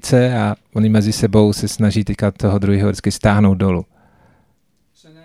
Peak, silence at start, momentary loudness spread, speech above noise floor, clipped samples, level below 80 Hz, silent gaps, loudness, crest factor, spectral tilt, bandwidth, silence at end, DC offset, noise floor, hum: 0 dBFS; 0.05 s; 5 LU; 48 dB; under 0.1%; -38 dBFS; none; -16 LUFS; 16 dB; -6.5 dB/octave; 14 kHz; 1.4 s; under 0.1%; -63 dBFS; none